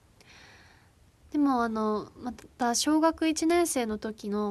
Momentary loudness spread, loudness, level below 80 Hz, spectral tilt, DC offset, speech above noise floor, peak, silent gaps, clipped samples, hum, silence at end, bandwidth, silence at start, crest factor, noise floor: 10 LU; -28 LUFS; -60 dBFS; -3.5 dB/octave; under 0.1%; 32 dB; -12 dBFS; none; under 0.1%; none; 0 s; 13 kHz; 1.35 s; 18 dB; -60 dBFS